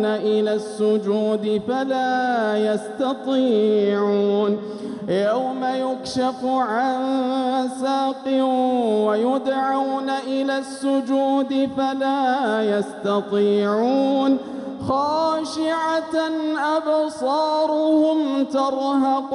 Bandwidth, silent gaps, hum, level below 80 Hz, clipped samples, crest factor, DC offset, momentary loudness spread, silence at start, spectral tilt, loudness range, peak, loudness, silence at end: 11.5 kHz; none; none; -64 dBFS; under 0.1%; 12 dB; under 0.1%; 5 LU; 0 s; -5.5 dB/octave; 2 LU; -8 dBFS; -21 LUFS; 0 s